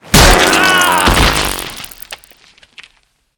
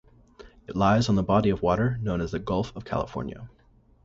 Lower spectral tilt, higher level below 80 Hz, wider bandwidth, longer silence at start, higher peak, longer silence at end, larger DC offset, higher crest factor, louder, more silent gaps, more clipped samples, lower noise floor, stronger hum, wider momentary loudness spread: second, -3 dB/octave vs -7 dB/octave; first, -20 dBFS vs -44 dBFS; first, over 20 kHz vs 7.8 kHz; second, 0.05 s vs 0.4 s; first, 0 dBFS vs -8 dBFS; first, 1.2 s vs 0.55 s; neither; second, 12 dB vs 20 dB; first, -9 LUFS vs -26 LUFS; neither; first, 0.4% vs under 0.1%; first, -56 dBFS vs -51 dBFS; neither; first, 22 LU vs 13 LU